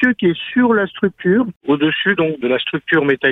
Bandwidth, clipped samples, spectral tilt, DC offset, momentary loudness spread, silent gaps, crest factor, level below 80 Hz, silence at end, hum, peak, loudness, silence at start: 4 kHz; under 0.1%; -8 dB/octave; under 0.1%; 4 LU; 1.56-1.61 s; 14 dB; -56 dBFS; 0 s; none; -2 dBFS; -16 LUFS; 0 s